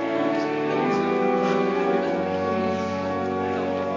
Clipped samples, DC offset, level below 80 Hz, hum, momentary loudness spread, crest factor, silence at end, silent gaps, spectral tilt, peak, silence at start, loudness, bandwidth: under 0.1%; under 0.1%; -52 dBFS; none; 4 LU; 14 dB; 0 s; none; -6.5 dB/octave; -10 dBFS; 0 s; -24 LUFS; 7.6 kHz